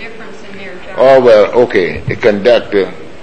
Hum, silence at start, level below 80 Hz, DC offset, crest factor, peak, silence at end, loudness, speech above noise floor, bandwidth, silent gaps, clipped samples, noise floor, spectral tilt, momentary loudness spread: none; 0 s; -42 dBFS; 4%; 12 dB; 0 dBFS; 0.15 s; -10 LUFS; 20 dB; 8.8 kHz; none; 0.8%; -30 dBFS; -6.5 dB/octave; 22 LU